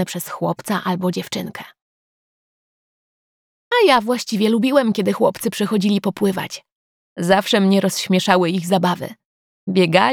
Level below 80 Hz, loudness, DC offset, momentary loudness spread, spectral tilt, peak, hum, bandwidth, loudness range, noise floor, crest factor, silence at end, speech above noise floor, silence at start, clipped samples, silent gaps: -64 dBFS; -18 LUFS; under 0.1%; 12 LU; -5 dB/octave; 0 dBFS; none; 18 kHz; 8 LU; under -90 dBFS; 18 dB; 0 s; over 72 dB; 0 s; under 0.1%; 1.82-3.71 s, 6.72-7.16 s, 9.25-9.67 s